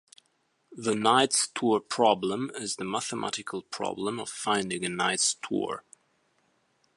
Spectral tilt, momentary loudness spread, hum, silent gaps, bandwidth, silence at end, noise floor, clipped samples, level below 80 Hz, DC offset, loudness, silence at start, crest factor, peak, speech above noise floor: -2.5 dB/octave; 11 LU; none; none; 11.5 kHz; 1.15 s; -72 dBFS; under 0.1%; -72 dBFS; under 0.1%; -28 LUFS; 0.7 s; 22 dB; -8 dBFS; 44 dB